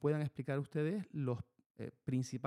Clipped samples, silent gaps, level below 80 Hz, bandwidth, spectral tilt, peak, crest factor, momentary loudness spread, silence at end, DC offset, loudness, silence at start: under 0.1%; 1.66-1.75 s; -74 dBFS; 11.5 kHz; -7.5 dB/octave; -22 dBFS; 16 dB; 13 LU; 0 s; under 0.1%; -40 LUFS; 0 s